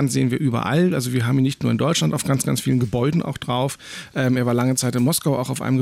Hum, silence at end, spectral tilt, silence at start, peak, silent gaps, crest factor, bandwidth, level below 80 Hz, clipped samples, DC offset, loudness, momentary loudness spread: none; 0 s; -5.5 dB/octave; 0 s; -8 dBFS; none; 12 dB; 16 kHz; -52 dBFS; under 0.1%; under 0.1%; -21 LUFS; 4 LU